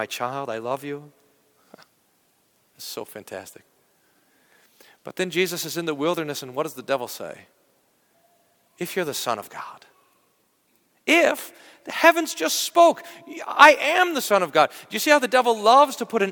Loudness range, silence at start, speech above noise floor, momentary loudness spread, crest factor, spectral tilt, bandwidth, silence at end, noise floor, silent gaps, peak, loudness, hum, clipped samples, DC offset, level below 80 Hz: 22 LU; 0 s; 44 dB; 21 LU; 24 dB; -2.5 dB/octave; 19 kHz; 0 s; -66 dBFS; none; 0 dBFS; -20 LUFS; none; under 0.1%; under 0.1%; -72 dBFS